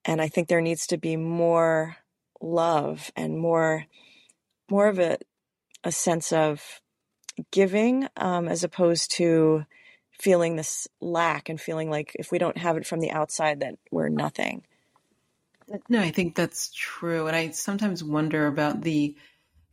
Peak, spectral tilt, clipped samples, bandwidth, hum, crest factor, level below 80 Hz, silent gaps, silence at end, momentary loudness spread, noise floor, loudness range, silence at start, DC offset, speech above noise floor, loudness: -8 dBFS; -5 dB/octave; under 0.1%; 16 kHz; none; 18 dB; -68 dBFS; none; 0.6 s; 10 LU; -72 dBFS; 4 LU; 0.05 s; under 0.1%; 47 dB; -25 LUFS